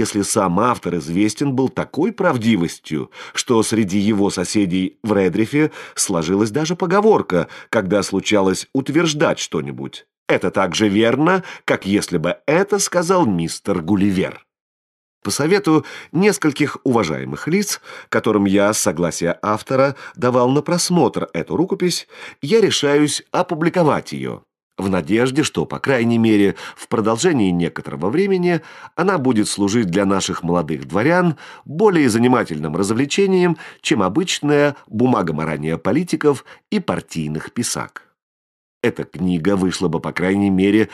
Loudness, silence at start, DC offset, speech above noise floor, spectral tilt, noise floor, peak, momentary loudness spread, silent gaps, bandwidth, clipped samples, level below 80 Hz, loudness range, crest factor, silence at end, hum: -18 LUFS; 0 s; under 0.1%; over 72 dB; -5 dB/octave; under -90 dBFS; -2 dBFS; 8 LU; 10.17-10.26 s, 14.61-15.21 s, 24.63-24.71 s, 38.23-38.81 s; 13 kHz; under 0.1%; -54 dBFS; 2 LU; 16 dB; 0 s; none